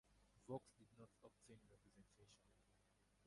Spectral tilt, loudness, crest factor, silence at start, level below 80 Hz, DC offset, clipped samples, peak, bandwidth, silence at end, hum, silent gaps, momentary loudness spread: -6.5 dB/octave; -61 LUFS; 26 dB; 0.05 s; -82 dBFS; under 0.1%; under 0.1%; -38 dBFS; 11 kHz; 0 s; 50 Hz at -80 dBFS; none; 14 LU